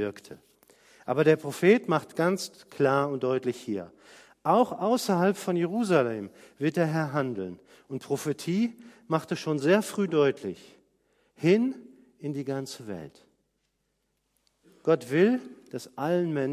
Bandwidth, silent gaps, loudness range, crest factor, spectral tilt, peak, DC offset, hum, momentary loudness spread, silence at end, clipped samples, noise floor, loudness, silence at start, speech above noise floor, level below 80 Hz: 15.5 kHz; none; 5 LU; 20 dB; -6 dB/octave; -8 dBFS; under 0.1%; none; 16 LU; 0 s; under 0.1%; -76 dBFS; -27 LUFS; 0 s; 50 dB; -72 dBFS